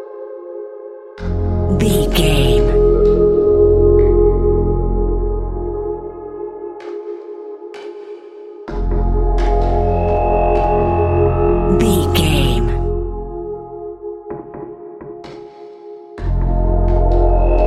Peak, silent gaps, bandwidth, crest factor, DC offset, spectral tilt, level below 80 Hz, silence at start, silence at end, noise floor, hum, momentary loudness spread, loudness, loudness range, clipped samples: 0 dBFS; none; 14 kHz; 14 dB; under 0.1%; -7 dB/octave; -20 dBFS; 0 s; 0 s; -35 dBFS; none; 20 LU; -16 LUFS; 14 LU; under 0.1%